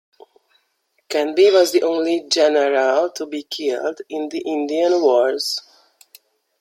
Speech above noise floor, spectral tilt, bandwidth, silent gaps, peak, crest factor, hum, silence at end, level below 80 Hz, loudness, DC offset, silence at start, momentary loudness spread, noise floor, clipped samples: 50 dB; -2 dB/octave; 16.5 kHz; none; -2 dBFS; 16 dB; none; 1 s; -74 dBFS; -18 LUFS; under 0.1%; 1.1 s; 12 LU; -67 dBFS; under 0.1%